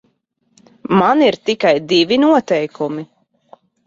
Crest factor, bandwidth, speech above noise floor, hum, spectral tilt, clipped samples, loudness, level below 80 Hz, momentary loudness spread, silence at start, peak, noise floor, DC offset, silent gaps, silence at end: 16 dB; 7.6 kHz; 50 dB; none; -5.5 dB/octave; under 0.1%; -15 LUFS; -60 dBFS; 11 LU; 0.9 s; -2 dBFS; -64 dBFS; under 0.1%; none; 0.85 s